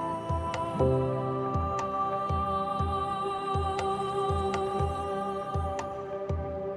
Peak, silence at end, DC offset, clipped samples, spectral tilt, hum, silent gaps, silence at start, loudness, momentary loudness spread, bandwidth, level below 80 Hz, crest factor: -16 dBFS; 0 s; under 0.1%; under 0.1%; -7 dB/octave; none; none; 0 s; -30 LUFS; 5 LU; 11.5 kHz; -42 dBFS; 14 dB